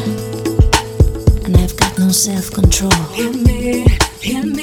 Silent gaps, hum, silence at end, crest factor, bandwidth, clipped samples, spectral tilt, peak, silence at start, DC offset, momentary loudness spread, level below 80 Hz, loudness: none; none; 0 s; 14 dB; over 20 kHz; under 0.1%; -4.5 dB/octave; 0 dBFS; 0 s; under 0.1%; 6 LU; -18 dBFS; -14 LUFS